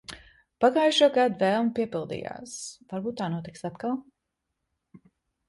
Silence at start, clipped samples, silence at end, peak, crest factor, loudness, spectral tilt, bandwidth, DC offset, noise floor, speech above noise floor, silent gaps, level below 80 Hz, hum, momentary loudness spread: 0.1 s; under 0.1%; 1.45 s; -8 dBFS; 20 dB; -26 LUFS; -4.5 dB/octave; 11.5 kHz; under 0.1%; -82 dBFS; 56 dB; none; -66 dBFS; none; 17 LU